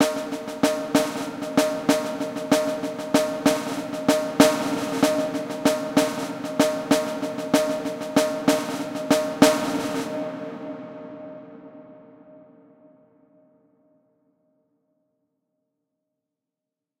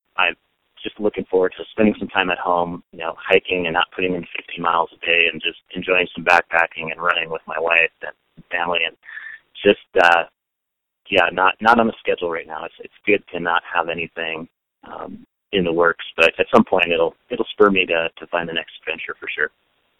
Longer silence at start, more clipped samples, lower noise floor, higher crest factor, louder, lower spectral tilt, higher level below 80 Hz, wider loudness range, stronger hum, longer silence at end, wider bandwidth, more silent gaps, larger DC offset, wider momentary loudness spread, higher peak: second, 0 s vs 0.2 s; neither; first, -87 dBFS vs -81 dBFS; about the same, 24 dB vs 20 dB; second, -23 LUFS vs -19 LUFS; second, -4 dB/octave vs -5.5 dB/octave; second, -62 dBFS vs -54 dBFS; first, 12 LU vs 3 LU; neither; first, 4.6 s vs 0.5 s; first, 16.5 kHz vs 11.5 kHz; neither; neither; about the same, 15 LU vs 14 LU; about the same, 0 dBFS vs 0 dBFS